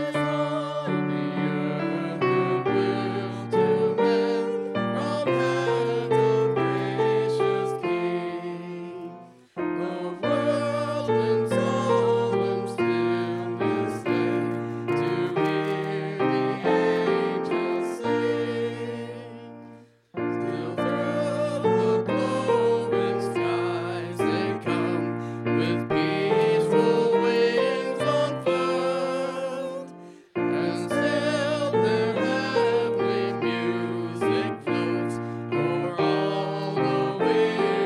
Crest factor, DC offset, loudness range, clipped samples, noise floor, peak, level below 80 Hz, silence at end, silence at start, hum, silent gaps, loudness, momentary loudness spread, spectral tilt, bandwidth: 16 dB; under 0.1%; 4 LU; under 0.1%; -49 dBFS; -10 dBFS; -68 dBFS; 0 s; 0 s; none; none; -25 LUFS; 8 LU; -6.5 dB/octave; 11.5 kHz